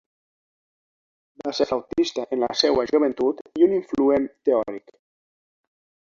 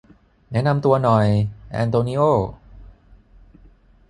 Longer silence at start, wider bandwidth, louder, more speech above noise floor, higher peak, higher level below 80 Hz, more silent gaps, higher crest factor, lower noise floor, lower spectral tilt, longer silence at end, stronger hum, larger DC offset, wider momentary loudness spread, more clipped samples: first, 1.45 s vs 0.5 s; second, 7.4 kHz vs 11 kHz; about the same, -22 LUFS vs -20 LUFS; first, over 68 dB vs 33 dB; about the same, -4 dBFS vs -2 dBFS; second, -58 dBFS vs -46 dBFS; first, 3.41-3.45 s vs none; about the same, 20 dB vs 18 dB; first, under -90 dBFS vs -51 dBFS; second, -4.5 dB/octave vs -8.5 dB/octave; about the same, 1.25 s vs 1.25 s; neither; neither; about the same, 8 LU vs 10 LU; neither